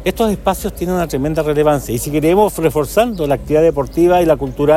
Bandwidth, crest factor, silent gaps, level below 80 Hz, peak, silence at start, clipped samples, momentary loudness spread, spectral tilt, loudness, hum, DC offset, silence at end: 16.5 kHz; 14 dB; none; -32 dBFS; 0 dBFS; 0 s; under 0.1%; 6 LU; -6 dB/octave; -15 LUFS; none; under 0.1%; 0 s